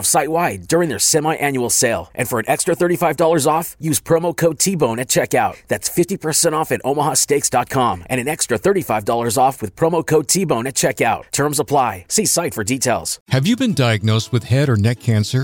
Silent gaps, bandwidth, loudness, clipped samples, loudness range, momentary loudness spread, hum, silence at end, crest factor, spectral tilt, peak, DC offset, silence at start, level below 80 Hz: 13.21-13.26 s; 17 kHz; -17 LUFS; under 0.1%; 1 LU; 4 LU; none; 0 s; 14 dB; -4 dB/octave; -2 dBFS; under 0.1%; 0 s; -50 dBFS